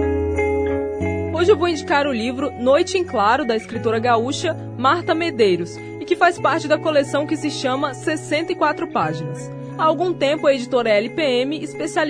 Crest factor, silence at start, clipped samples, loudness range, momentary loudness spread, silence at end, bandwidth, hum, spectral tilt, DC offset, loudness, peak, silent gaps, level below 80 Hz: 18 dB; 0 s; under 0.1%; 2 LU; 7 LU; 0 s; 10.5 kHz; none; -5 dB/octave; under 0.1%; -19 LUFS; -2 dBFS; none; -44 dBFS